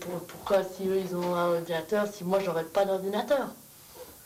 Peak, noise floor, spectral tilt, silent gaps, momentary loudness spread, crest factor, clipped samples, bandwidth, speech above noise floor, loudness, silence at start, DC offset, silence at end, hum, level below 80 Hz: -14 dBFS; -48 dBFS; -5.5 dB/octave; none; 13 LU; 16 dB; under 0.1%; 16 kHz; 20 dB; -29 LUFS; 0 s; under 0.1%; 0 s; none; -66 dBFS